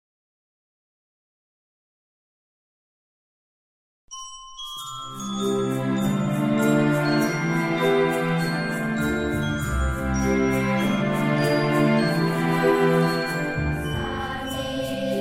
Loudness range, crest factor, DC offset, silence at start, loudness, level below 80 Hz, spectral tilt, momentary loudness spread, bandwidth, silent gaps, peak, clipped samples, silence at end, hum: 10 LU; 16 dB; under 0.1%; 4.1 s; -23 LUFS; -40 dBFS; -6 dB/octave; 12 LU; 16 kHz; none; -8 dBFS; under 0.1%; 0 s; none